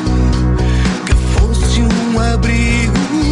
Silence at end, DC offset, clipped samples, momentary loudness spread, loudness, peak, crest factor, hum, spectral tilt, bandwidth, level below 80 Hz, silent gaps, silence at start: 0 s; under 0.1%; under 0.1%; 1 LU; -14 LUFS; 0 dBFS; 12 dB; none; -5.5 dB/octave; 11 kHz; -16 dBFS; none; 0 s